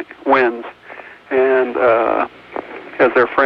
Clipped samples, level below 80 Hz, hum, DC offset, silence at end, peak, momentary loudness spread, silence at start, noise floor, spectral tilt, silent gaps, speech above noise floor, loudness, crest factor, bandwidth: under 0.1%; -56 dBFS; none; under 0.1%; 0 s; -2 dBFS; 19 LU; 0 s; -37 dBFS; -7 dB/octave; none; 23 dB; -16 LUFS; 14 dB; 5.6 kHz